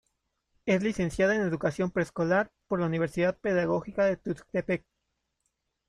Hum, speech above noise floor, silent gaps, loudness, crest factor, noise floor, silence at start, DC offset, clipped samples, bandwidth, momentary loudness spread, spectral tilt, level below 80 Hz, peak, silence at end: none; 52 dB; none; -29 LUFS; 18 dB; -80 dBFS; 0.65 s; under 0.1%; under 0.1%; 11.5 kHz; 7 LU; -7 dB/octave; -56 dBFS; -12 dBFS; 1.1 s